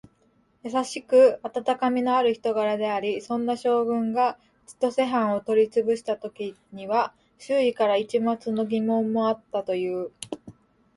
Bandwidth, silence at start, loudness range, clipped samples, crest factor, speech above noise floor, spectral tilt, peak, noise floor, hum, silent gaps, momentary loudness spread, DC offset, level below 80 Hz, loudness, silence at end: 11.5 kHz; 0.65 s; 3 LU; under 0.1%; 18 dB; 40 dB; -5.5 dB/octave; -8 dBFS; -64 dBFS; none; none; 10 LU; under 0.1%; -70 dBFS; -24 LUFS; 0.45 s